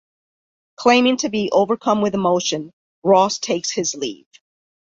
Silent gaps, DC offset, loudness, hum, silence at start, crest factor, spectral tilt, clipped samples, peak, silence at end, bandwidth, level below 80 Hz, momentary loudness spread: 2.73-3.02 s; under 0.1%; -18 LUFS; none; 0.8 s; 20 dB; -3.5 dB/octave; under 0.1%; 0 dBFS; 0.8 s; 7.8 kHz; -62 dBFS; 11 LU